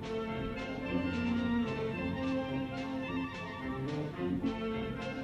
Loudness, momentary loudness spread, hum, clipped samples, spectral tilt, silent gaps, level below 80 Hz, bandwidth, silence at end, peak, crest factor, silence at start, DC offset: -36 LUFS; 5 LU; none; under 0.1%; -7 dB/octave; none; -54 dBFS; 11 kHz; 0 s; -22 dBFS; 14 dB; 0 s; under 0.1%